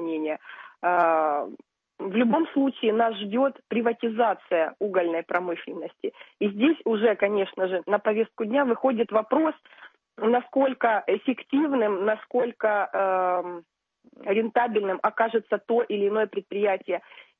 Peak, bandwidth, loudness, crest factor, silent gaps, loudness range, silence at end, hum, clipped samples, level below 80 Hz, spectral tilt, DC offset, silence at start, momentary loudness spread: -8 dBFS; 3.9 kHz; -25 LUFS; 16 dB; none; 2 LU; 0.15 s; none; under 0.1%; -78 dBFS; -8.5 dB/octave; under 0.1%; 0 s; 9 LU